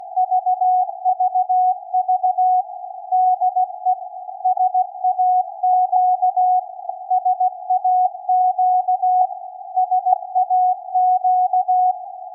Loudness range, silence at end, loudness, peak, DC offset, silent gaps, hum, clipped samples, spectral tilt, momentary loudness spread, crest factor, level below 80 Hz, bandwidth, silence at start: 1 LU; 0 s; -18 LUFS; -2 dBFS; under 0.1%; none; none; under 0.1%; 5 dB/octave; 6 LU; 16 dB; under -90 dBFS; 0.9 kHz; 0 s